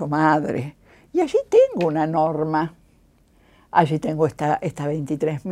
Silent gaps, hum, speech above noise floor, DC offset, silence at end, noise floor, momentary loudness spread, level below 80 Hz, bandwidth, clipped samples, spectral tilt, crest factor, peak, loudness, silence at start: none; none; 36 dB; under 0.1%; 0 s; -57 dBFS; 10 LU; -56 dBFS; 12 kHz; under 0.1%; -7.5 dB/octave; 20 dB; -2 dBFS; -21 LUFS; 0 s